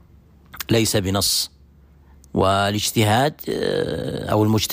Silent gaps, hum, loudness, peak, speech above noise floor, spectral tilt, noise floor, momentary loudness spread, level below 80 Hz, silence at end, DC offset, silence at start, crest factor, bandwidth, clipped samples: none; none; -20 LUFS; -6 dBFS; 30 dB; -4.5 dB/octave; -50 dBFS; 8 LU; -46 dBFS; 0 s; under 0.1%; 0.55 s; 14 dB; 15.5 kHz; under 0.1%